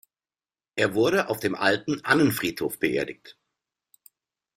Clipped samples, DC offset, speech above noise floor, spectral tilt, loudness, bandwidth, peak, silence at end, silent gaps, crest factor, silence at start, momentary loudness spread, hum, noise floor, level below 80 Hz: under 0.1%; under 0.1%; over 66 dB; -4.5 dB/octave; -24 LUFS; 16 kHz; -4 dBFS; 1.25 s; none; 22 dB; 0.75 s; 10 LU; none; under -90 dBFS; -62 dBFS